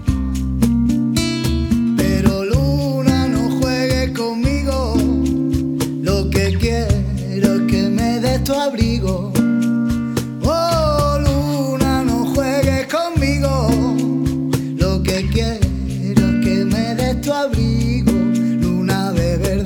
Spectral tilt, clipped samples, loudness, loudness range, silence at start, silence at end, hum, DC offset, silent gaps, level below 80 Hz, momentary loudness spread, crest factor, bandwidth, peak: -6.5 dB/octave; under 0.1%; -17 LUFS; 1 LU; 0 s; 0 s; none; under 0.1%; none; -26 dBFS; 3 LU; 16 dB; 18.5 kHz; 0 dBFS